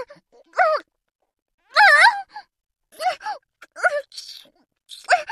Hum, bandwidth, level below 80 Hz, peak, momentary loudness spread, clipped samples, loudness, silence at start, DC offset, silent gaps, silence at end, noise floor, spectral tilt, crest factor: none; 14 kHz; -76 dBFS; -2 dBFS; 26 LU; under 0.1%; -18 LUFS; 0 s; under 0.1%; 1.42-1.46 s, 1.54-1.58 s; 0 s; -50 dBFS; 2 dB/octave; 20 dB